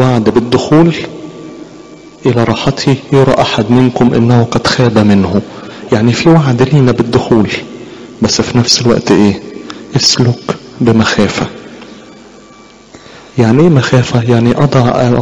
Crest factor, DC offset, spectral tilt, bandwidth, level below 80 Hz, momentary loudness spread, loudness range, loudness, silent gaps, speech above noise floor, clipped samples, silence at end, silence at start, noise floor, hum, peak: 10 dB; under 0.1%; -5.5 dB/octave; 10.5 kHz; -38 dBFS; 18 LU; 4 LU; -10 LUFS; none; 29 dB; under 0.1%; 0 s; 0 s; -37 dBFS; none; 0 dBFS